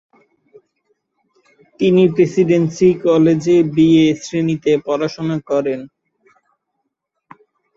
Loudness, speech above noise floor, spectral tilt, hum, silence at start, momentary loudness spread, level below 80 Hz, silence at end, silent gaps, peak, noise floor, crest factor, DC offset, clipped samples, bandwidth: -15 LUFS; 60 dB; -7 dB/octave; none; 1.8 s; 8 LU; -56 dBFS; 1.9 s; none; -2 dBFS; -74 dBFS; 14 dB; under 0.1%; under 0.1%; 7.6 kHz